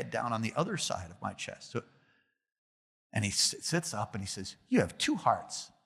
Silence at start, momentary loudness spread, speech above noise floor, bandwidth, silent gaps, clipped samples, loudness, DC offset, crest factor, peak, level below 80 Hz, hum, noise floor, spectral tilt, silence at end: 0 s; 13 LU; 39 dB; 15.5 kHz; 2.58-3.10 s; under 0.1%; -33 LUFS; under 0.1%; 22 dB; -12 dBFS; -70 dBFS; none; -72 dBFS; -3.5 dB/octave; 0.2 s